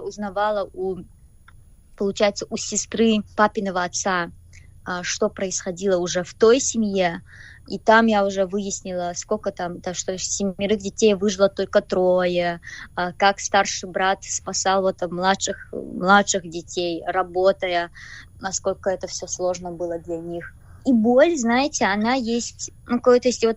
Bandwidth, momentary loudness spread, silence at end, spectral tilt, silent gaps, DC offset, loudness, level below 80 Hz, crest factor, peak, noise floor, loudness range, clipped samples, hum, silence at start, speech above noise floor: 10.5 kHz; 13 LU; 0 s; -3.5 dB/octave; none; under 0.1%; -22 LUFS; -50 dBFS; 20 dB; -2 dBFS; -48 dBFS; 4 LU; under 0.1%; none; 0 s; 27 dB